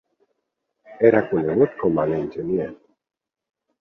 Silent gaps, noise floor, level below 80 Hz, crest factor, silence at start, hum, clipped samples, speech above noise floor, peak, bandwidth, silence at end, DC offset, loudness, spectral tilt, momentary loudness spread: none; -77 dBFS; -56 dBFS; 22 dB; 0.9 s; none; under 0.1%; 58 dB; -2 dBFS; 4.3 kHz; 1.05 s; under 0.1%; -21 LUFS; -10.5 dB/octave; 9 LU